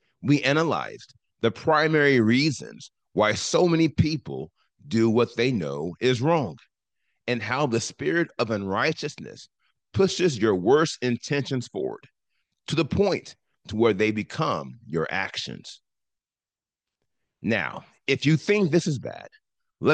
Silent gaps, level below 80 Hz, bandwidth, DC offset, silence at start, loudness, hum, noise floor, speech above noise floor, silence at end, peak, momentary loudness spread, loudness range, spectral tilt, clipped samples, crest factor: none; -62 dBFS; 9.8 kHz; under 0.1%; 0.2 s; -24 LUFS; none; under -90 dBFS; over 66 dB; 0 s; -6 dBFS; 14 LU; 5 LU; -5.5 dB/octave; under 0.1%; 18 dB